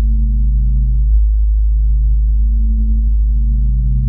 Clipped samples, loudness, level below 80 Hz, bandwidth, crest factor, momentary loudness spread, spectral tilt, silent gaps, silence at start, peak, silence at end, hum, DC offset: under 0.1%; -16 LUFS; -12 dBFS; 0.3 kHz; 8 dB; 1 LU; -13.5 dB/octave; none; 0 s; -4 dBFS; 0 s; none; under 0.1%